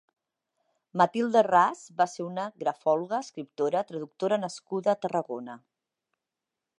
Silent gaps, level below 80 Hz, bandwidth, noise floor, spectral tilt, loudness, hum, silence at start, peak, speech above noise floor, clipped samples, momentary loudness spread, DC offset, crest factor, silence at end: none; -82 dBFS; 11 kHz; -88 dBFS; -5.5 dB/octave; -28 LUFS; none; 0.95 s; -8 dBFS; 60 dB; under 0.1%; 14 LU; under 0.1%; 20 dB; 1.2 s